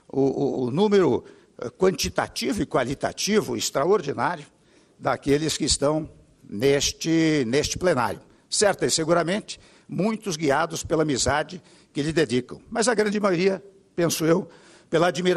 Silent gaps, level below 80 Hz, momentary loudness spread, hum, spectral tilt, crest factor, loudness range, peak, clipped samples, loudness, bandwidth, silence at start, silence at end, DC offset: none; -48 dBFS; 12 LU; none; -4 dB/octave; 18 dB; 2 LU; -6 dBFS; under 0.1%; -23 LUFS; 13 kHz; 0.15 s; 0 s; under 0.1%